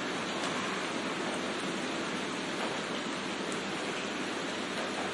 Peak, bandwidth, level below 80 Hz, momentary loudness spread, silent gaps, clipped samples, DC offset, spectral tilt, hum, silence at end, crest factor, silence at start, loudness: -18 dBFS; 11.5 kHz; -76 dBFS; 2 LU; none; under 0.1%; under 0.1%; -3 dB/octave; none; 0 s; 16 dB; 0 s; -34 LUFS